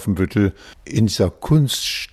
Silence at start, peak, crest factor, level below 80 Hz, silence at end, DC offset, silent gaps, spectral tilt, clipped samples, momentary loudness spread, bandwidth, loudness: 0 s; -4 dBFS; 14 dB; -40 dBFS; 0.05 s; under 0.1%; none; -5.5 dB/octave; under 0.1%; 5 LU; 14 kHz; -19 LUFS